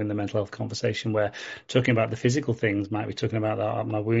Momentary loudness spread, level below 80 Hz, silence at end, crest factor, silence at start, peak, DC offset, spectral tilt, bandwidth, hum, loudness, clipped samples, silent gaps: 6 LU; -62 dBFS; 0 s; 18 dB; 0 s; -8 dBFS; under 0.1%; -5.5 dB/octave; 8 kHz; none; -27 LUFS; under 0.1%; none